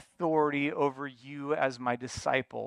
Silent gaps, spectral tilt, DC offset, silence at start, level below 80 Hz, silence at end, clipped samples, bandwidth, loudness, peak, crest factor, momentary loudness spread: none; -5.5 dB/octave; under 0.1%; 0.2 s; -62 dBFS; 0 s; under 0.1%; 11 kHz; -31 LUFS; -12 dBFS; 18 dB; 12 LU